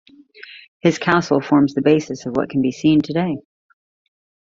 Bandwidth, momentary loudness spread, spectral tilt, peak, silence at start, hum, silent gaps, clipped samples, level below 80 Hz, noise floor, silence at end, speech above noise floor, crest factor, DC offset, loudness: 7.4 kHz; 14 LU; -6.5 dB/octave; 0 dBFS; 0.5 s; none; 0.68-0.80 s; under 0.1%; -56 dBFS; -42 dBFS; 1.05 s; 25 dB; 20 dB; under 0.1%; -18 LUFS